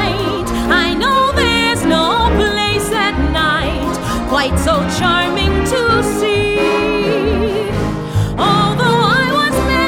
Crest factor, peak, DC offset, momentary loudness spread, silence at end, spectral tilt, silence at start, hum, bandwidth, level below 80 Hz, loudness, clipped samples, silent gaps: 14 dB; 0 dBFS; under 0.1%; 6 LU; 0 s; -5 dB/octave; 0 s; none; 17.5 kHz; -26 dBFS; -14 LUFS; under 0.1%; none